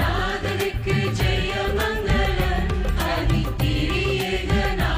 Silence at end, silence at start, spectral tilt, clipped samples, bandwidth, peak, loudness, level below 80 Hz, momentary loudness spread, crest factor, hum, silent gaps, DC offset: 0 s; 0 s; -5.5 dB/octave; under 0.1%; 16 kHz; -10 dBFS; -23 LUFS; -26 dBFS; 2 LU; 12 dB; none; none; under 0.1%